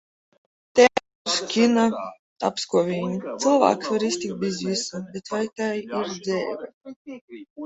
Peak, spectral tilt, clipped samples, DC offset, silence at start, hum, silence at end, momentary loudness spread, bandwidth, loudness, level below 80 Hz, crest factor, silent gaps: -2 dBFS; -4 dB/octave; under 0.1%; under 0.1%; 0.75 s; none; 0 s; 19 LU; 8.2 kHz; -23 LUFS; -66 dBFS; 22 dB; 1.15-1.25 s, 2.19-2.36 s, 6.74-6.81 s, 6.96-7.05 s, 7.21-7.28 s, 7.50-7.56 s